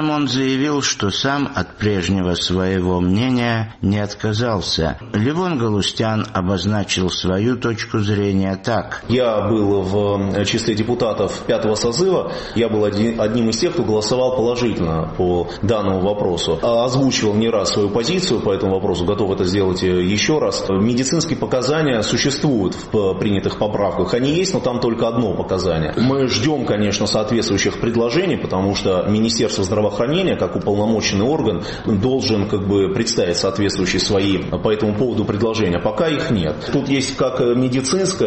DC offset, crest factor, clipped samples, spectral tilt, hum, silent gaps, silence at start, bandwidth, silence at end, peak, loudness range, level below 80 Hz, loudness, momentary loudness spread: 0.2%; 14 dB; under 0.1%; -5 dB/octave; none; none; 0 s; 8.8 kHz; 0 s; -4 dBFS; 1 LU; -40 dBFS; -18 LUFS; 3 LU